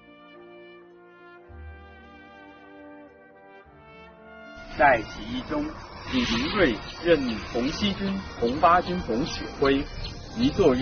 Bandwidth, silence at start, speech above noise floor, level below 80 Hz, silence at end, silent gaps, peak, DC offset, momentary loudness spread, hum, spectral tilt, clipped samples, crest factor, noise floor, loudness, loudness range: 6.6 kHz; 0.2 s; 26 dB; -44 dBFS; 0 s; none; -6 dBFS; under 0.1%; 26 LU; none; -3.5 dB/octave; under 0.1%; 22 dB; -50 dBFS; -25 LUFS; 23 LU